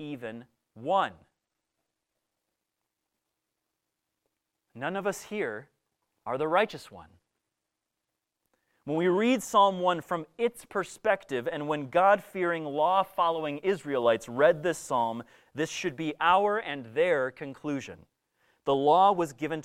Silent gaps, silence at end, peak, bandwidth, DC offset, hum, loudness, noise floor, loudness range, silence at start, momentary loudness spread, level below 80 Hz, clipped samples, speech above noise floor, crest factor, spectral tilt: none; 0 s; -10 dBFS; 16 kHz; under 0.1%; none; -28 LUFS; -85 dBFS; 10 LU; 0 s; 14 LU; -70 dBFS; under 0.1%; 58 dB; 20 dB; -5 dB/octave